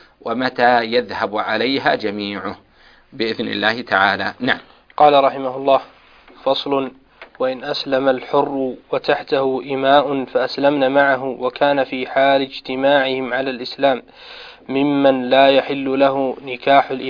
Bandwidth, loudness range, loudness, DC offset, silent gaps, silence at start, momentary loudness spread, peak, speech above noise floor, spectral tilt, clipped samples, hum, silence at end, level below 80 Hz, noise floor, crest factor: 5.2 kHz; 3 LU; -18 LUFS; under 0.1%; none; 0.25 s; 10 LU; 0 dBFS; 29 dB; -6.5 dB/octave; under 0.1%; none; 0 s; -58 dBFS; -46 dBFS; 18 dB